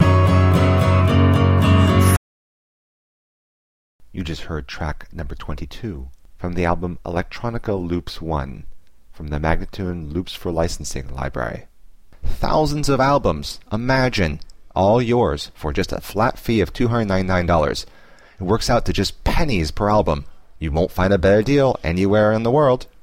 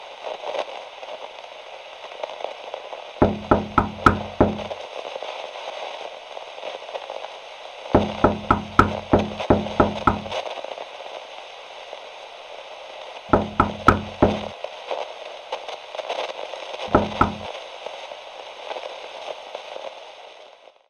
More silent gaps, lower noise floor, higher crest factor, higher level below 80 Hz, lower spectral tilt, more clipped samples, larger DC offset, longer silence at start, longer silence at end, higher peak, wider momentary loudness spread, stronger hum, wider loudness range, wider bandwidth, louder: first, 2.17-3.99 s vs none; second, -44 dBFS vs -48 dBFS; second, 18 dB vs 26 dB; first, -30 dBFS vs -42 dBFS; about the same, -6.5 dB/octave vs -6.5 dB/octave; neither; first, 0.7% vs under 0.1%; about the same, 0 s vs 0 s; second, 0.2 s vs 0.35 s; about the same, -2 dBFS vs 0 dBFS; second, 15 LU vs 18 LU; neither; about the same, 9 LU vs 8 LU; first, 16 kHz vs 11.5 kHz; first, -19 LUFS vs -24 LUFS